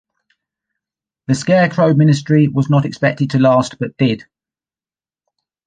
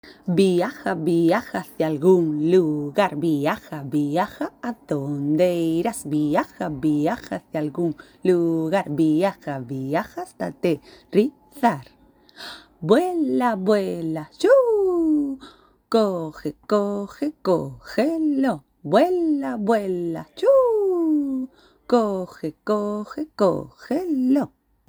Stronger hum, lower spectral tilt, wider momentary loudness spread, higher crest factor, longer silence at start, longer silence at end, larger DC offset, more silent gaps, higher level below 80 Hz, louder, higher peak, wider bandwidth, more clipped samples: neither; about the same, -7 dB/octave vs -7 dB/octave; second, 8 LU vs 11 LU; about the same, 16 dB vs 20 dB; first, 1.3 s vs 0.05 s; first, 1.5 s vs 0.4 s; neither; neither; about the same, -56 dBFS vs -60 dBFS; first, -14 LUFS vs -22 LUFS; about the same, -2 dBFS vs -2 dBFS; second, 9.4 kHz vs over 20 kHz; neither